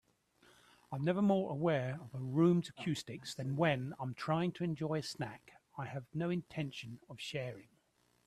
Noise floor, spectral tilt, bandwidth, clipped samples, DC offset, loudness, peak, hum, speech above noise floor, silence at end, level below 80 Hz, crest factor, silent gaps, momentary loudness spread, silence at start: -75 dBFS; -6.5 dB/octave; 13.5 kHz; under 0.1%; under 0.1%; -37 LUFS; -18 dBFS; none; 38 dB; 0.65 s; -74 dBFS; 18 dB; none; 15 LU; 0.9 s